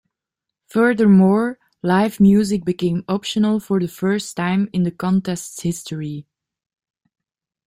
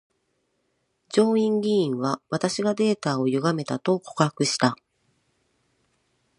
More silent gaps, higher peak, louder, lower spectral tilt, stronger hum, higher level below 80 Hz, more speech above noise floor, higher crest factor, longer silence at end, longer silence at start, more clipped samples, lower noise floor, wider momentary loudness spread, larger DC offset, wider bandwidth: neither; about the same, -4 dBFS vs -2 dBFS; first, -19 LUFS vs -24 LUFS; first, -6.5 dB/octave vs -5 dB/octave; neither; first, -54 dBFS vs -72 dBFS; first, 67 dB vs 50 dB; second, 16 dB vs 22 dB; second, 1.45 s vs 1.65 s; second, 0.75 s vs 1.1 s; neither; first, -84 dBFS vs -73 dBFS; first, 13 LU vs 5 LU; neither; first, 15.5 kHz vs 11 kHz